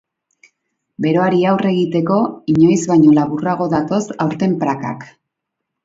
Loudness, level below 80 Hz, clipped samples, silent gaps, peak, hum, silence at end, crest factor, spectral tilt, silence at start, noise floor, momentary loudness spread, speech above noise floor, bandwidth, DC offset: -15 LUFS; -56 dBFS; under 0.1%; none; -2 dBFS; none; 0.8 s; 16 dB; -7 dB/octave; 1 s; -78 dBFS; 9 LU; 64 dB; 8 kHz; under 0.1%